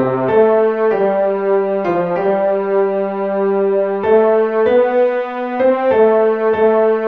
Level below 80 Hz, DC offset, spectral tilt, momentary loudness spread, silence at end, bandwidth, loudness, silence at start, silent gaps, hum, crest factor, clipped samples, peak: -56 dBFS; 0.3%; -9 dB/octave; 5 LU; 0 s; 4.7 kHz; -14 LUFS; 0 s; none; none; 12 dB; under 0.1%; -2 dBFS